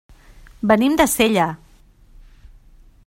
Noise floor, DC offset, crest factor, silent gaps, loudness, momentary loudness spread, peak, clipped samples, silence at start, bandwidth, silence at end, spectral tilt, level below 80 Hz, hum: -50 dBFS; under 0.1%; 20 dB; none; -17 LUFS; 11 LU; 0 dBFS; under 0.1%; 0.65 s; 16 kHz; 1.5 s; -4 dB/octave; -44 dBFS; none